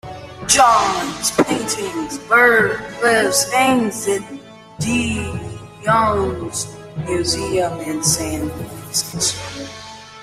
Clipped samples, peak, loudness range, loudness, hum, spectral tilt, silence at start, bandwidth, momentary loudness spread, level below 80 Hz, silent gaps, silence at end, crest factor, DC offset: under 0.1%; 0 dBFS; 5 LU; -17 LUFS; none; -3 dB/octave; 0.05 s; 16 kHz; 17 LU; -44 dBFS; none; 0 s; 18 dB; under 0.1%